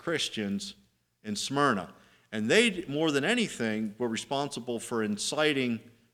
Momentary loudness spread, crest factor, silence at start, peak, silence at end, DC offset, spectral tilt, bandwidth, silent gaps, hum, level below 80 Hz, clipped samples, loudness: 12 LU; 22 dB; 0.05 s; -8 dBFS; 0.25 s; under 0.1%; -3.5 dB/octave; 15.5 kHz; none; none; -70 dBFS; under 0.1%; -29 LUFS